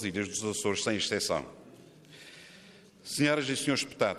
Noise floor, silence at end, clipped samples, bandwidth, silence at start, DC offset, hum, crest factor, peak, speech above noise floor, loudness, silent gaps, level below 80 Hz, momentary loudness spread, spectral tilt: -55 dBFS; 0 s; under 0.1%; 14.5 kHz; 0 s; under 0.1%; none; 20 dB; -12 dBFS; 24 dB; -30 LUFS; none; -66 dBFS; 22 LU; -3.5 dB/octave